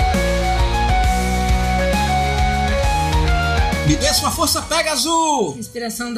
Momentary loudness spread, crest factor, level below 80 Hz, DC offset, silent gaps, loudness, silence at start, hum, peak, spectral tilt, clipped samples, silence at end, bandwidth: 2 LU; 14 dB; -22 dBFS; under 0.1%; none; -18 LUFS; 0 s; none; -4 dBFS; -4 dB/octave; under 0.1%; 0 s; 16 kHz